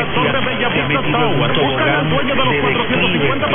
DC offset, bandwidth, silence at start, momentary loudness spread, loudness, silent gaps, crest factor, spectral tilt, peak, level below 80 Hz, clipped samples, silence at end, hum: under 0.1%; 3.8 kHz; 0 s; 2 LU; -15 LUFS; none; 12 dB; -9.5 dB/octave; -2 dBFS; -38 dBFS; under 0.1%; 0 s; none